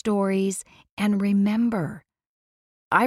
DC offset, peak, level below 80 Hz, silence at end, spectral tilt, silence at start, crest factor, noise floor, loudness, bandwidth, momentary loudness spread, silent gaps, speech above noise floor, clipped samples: under 0.1%; -6 dBFS; -62 dBFS; 0 s; -6 dB/octave; 0.05 s; 20 dB; under -90 dBFS; -24 LUFS; 13.5 kHz; 13 LU; 0.91-0.97 s, 2.26-2.91 s; over 67 dB; under 0.1%